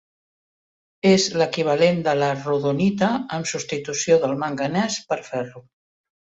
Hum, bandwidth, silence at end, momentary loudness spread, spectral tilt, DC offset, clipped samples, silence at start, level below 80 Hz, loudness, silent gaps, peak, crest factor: none; 8.4 kHz; 0.6 s; 8 LU; -4.5 dB/octave; under 0.1%; under 0.1%; 1.05 s; -60 dBFS; -21 LUFS; none; -4 dBFS; 18 dB